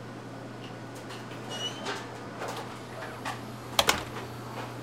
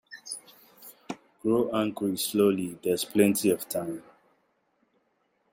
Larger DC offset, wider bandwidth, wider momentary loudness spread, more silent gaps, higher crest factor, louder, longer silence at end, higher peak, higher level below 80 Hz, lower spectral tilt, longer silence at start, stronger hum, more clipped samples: neither; about the same, 16 kHz vs 16.5 kHz; second, 15 LU vs 18 LU; neither; first, 32 dB vs 22 dB; second, -34 LUFS vs -27 LUFS; second, 0 s vs 1.5 s; first, -4 dBFS vs -8 dBFS; first, -58 dBFS vs -70 dBFS; second, -3 dB/octave vs -4.5 dB/octave; about the same, 0 s vs 0.1 s; neither; neither